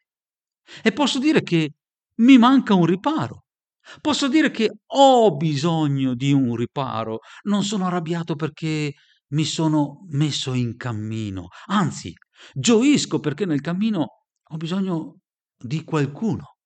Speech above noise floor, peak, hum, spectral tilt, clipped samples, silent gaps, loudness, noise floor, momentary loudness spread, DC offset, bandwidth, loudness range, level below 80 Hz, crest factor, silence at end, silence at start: over 70 dB; -2 dBFS; none; -5.5 dB/octave; under 0.1%; none; -21 LUFS; under -90 dBFS; 14 LU; under 0.1%; 9.2 kHz; 6 LU; -62 dBFS; 20 dB; 0.2 s; 0.7 s